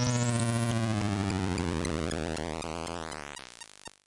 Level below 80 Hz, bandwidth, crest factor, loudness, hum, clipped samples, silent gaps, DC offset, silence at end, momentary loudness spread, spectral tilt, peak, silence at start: -52 dBFS; 11.5 kHz; 16 dB; -32 LUFS; none; under 0.1%; none; under 0.1%; 0.2 s; 15 LU; -5 dB/octave; -16 dBFS; 0 s